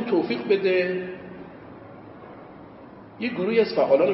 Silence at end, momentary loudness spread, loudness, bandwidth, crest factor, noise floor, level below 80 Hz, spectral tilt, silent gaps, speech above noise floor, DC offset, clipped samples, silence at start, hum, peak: 0 s; 23 LU; -23 LUFS; 5.8 kHz; 18 dB; -44 dBFS; -64 dBFS; -10 dB/octave; none; 23 dB; under 0.1%; under 0.1%; 0 s; none; -8 dBFS